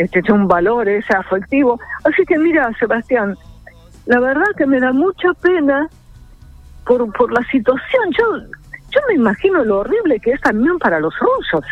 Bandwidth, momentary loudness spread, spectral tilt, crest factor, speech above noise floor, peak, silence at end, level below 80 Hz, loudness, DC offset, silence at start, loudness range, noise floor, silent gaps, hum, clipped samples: 8.4 kHz; 5 LU; -7.5 dB/octave; 14 dB; 26 dB; 0 dBFS; 0 s; -42 dBFS; -15 LUFS; under 0.1%; 0 s; 2 LU; -41 dBFS; none; none; under 0.1%